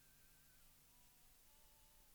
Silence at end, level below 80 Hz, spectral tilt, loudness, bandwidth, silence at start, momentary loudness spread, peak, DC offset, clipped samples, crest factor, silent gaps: 0 s; -76 dBFS; -2 dB/octave; -68 LUFS; over 20 kHz; 0 s; 0 LU; -56 dBFS; under 0.1%; under 0.1%; 12 dB; none